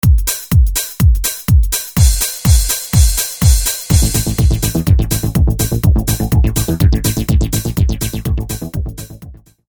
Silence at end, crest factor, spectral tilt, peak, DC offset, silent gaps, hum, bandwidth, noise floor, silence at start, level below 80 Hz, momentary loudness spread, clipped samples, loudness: 0.35 s; 12 dB; -4.5 dB/octave; 0 dBFS; under 0.1%; none; none; over 20 kHz; -36 dBFS; 0.05 s; -16 dBFS; 7 LU; under 0.1%; -14 LUFS